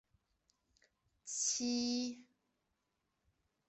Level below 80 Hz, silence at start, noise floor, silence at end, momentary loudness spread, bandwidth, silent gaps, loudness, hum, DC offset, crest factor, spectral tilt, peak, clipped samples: -82 dBFS; 1.25 s; -85 dBFS; 1.45 s; 18 LU; 8.4 kHz; none; -37 LUFS; none; under 0.1%; 18 dB; -1 dB/octave; -26 dBFS; under 0.1%